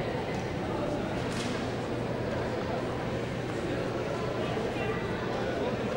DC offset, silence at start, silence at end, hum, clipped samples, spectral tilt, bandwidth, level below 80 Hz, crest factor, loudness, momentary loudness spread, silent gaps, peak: under 0.1%; 0 s; 0 s; none; under 0.1%; -6 dB/octave; 16 kHz; -50 dBFS; 14 dB; -32 LUFS; 2 LU; none; -18 dBFS